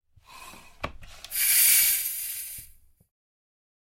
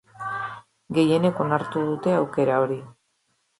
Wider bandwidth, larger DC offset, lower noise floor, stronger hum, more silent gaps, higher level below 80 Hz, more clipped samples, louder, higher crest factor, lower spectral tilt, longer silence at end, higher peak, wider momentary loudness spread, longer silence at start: first, 16.5 kHz vs 11.5 kHz; neither; second, -53 dBFS vs -71 dBFS; neither; neither; first, -54 dBFS vs -66 dBFS; neither; first, -21 LUFS vs -24 LUFS; about the same, 22 dB vs 18 dB; second, 1.5 dB/octave vs -7.5 dB/octave; first, 1.35 s vs 0.7 s; about the same, -6 dBFS vs -8 dBFS; first, 22 LU vs 12 LU; first, 0.3 s vs 0.15 s